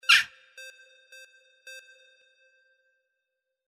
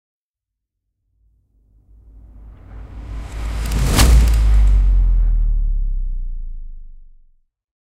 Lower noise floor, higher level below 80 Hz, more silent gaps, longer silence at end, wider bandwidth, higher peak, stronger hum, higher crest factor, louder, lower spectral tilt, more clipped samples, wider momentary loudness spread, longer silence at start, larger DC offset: about the same, -84 dBFS vs -83 dBFS; second, -80 dBFS vs -18 dBFS; neither; first, 2 s vs 0.95 s; about the same, 15.5 kHz vs 15.5 kHz; second, -6 dBFS vs 0 dBFS; neither; first, 26 dB vs 18 dB; second, -22 LUFS vs -18 LUFS; second, 3.5 dB/octave vs -4.5 dB/octave; neither; first, 30 LU vs 23 LU; second, 0.1 s vs 2.35 s; neither